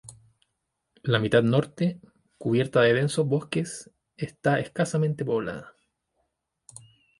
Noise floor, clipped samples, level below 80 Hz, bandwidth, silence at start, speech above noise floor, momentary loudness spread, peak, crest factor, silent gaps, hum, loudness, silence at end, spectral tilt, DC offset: -80 dBFS; under 0.1%; -62 dBFS; 11.5 kHz; 0.05 s; 55 dB; 15 LU; -6 dBFS; 20 dB; none; none; -25 LUFS; 1.5 s; -6 dB/octave; under 0.1%